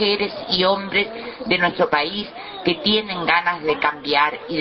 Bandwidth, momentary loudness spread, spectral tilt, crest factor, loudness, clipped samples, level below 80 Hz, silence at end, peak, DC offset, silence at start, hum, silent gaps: 6 kHz; 7 LU; -6 dB/octave; 18 dB; -20 LUFS; under 0.1%; -54 dBFS; 0 s; -2 dBFS; under 0.1%; 0 s; none; none